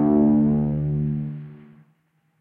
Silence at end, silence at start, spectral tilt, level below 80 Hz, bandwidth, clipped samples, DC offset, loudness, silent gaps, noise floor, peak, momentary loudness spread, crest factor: 0.85 s; 0 s; -14 dB/octave; -44 dBFS; 2.8 kHz; under 0.1%; under 0.1%; -21 LUFS; none; -66 dBFS; -10 dBFS; 18 LU; 14 dB